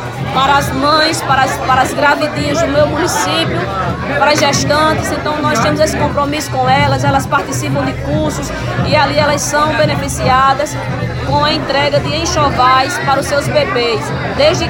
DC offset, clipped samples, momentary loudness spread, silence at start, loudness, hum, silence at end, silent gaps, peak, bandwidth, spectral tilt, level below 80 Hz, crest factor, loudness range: under 0.1%; under 0.1%; 6 LU; 0 s; -13 LUFS; none; 0 s; none; 0 dBFS; 17 kHz; -4.5 dB/octave; -32 dBFS; 12 dB; 1 LU